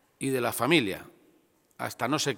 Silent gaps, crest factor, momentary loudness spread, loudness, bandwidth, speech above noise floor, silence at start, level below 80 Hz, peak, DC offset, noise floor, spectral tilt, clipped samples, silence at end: none; 22 dB; 14 LU; -28 LUFS; 17 kHz; 38 dB; 0.2 s; -70 dBFS; -8 dBFS; under 0.1%; -65 dBFS; -4 dB/octave; under 0.1%; 0 s